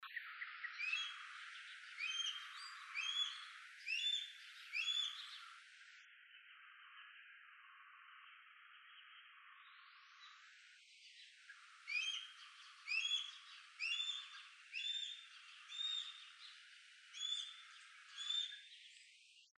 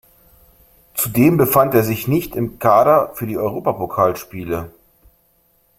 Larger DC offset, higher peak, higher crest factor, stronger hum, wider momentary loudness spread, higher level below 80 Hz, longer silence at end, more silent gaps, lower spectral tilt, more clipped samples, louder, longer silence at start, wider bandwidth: neither; second, -30 dBFS vs -2 dBFS; about the same, 20 dB vs 18 dB; neither; first, 21 LU vs 13 LU; second, under -90 dBFS vs -48 dBFS; second, 0.1 s vs 1.1 s; neither; second, 9 dB/octave vs -6.5 dB/octave; neither; second, -43 LUFS vs -17 LUFS; second, 0 s vs 0.95 s; second, 12 kHz vs 16.5 kHz